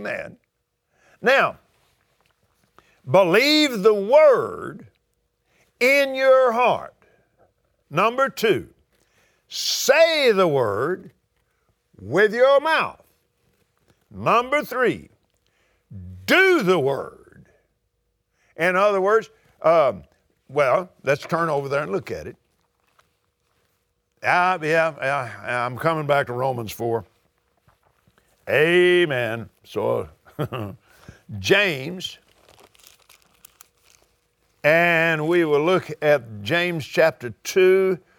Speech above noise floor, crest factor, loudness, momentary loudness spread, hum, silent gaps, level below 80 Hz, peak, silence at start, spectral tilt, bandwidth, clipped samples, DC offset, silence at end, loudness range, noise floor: 54 dB; 20 dB; -20 LUFS; 16 LU; none; none; -62 dBFS; -2 dBFS; 0 s; -4.5 dB/octave; 20 kHz; under 0.1%; under 0.1%; 0.2 s; 7 LU; -73 dBFS